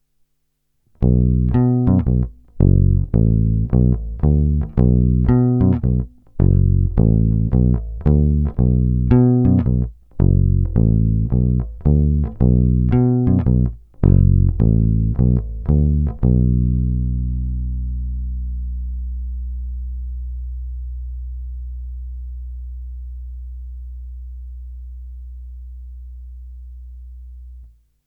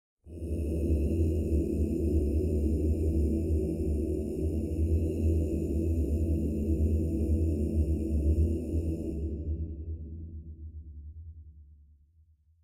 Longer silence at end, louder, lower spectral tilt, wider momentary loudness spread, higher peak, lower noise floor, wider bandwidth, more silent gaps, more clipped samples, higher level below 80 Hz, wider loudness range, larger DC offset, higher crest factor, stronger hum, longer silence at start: second, 0.4 s vs 0.9 s; first, -17 LUFS vs -30 LUFS; first, -14 dB/octave vs -10 dB/octave; first, 20 LU vs 15 LU; first, 0 dBFS vs -16 dBFS; first, -68 dBFS vs -63 dBFS; second, 2.8 kHz vs 10.5 kHz; neither; neither; first, -22 dBFS vs -34 dBFS; first, 18 LU vs 8 LU; neither; about the same, 16 dB vs 14 dB; neither; first, 1 s vs 0.25 s